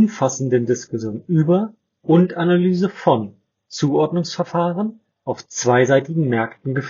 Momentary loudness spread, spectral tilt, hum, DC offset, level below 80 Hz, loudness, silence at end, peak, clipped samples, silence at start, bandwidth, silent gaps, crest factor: 12 LU; -6.5 dB/octave; none; under 0.1%; -64 dBFS; -19 LUFS; 0 s; -2 dBFS; under 0.1%; 0 s; 7.6 kHz; none; 16 dB